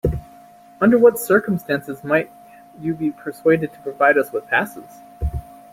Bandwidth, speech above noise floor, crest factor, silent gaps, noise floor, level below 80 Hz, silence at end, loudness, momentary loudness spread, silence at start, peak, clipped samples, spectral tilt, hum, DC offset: 16.5 kHz; 27 dB; 18 dB; none; -46 dBFS; -38 dBFS; 0.3 s; -19 LUFS; 15 LU; 0.05 s; -2 dBFS; under 0.1%; -6.5 dB/octave; none; under 0.1%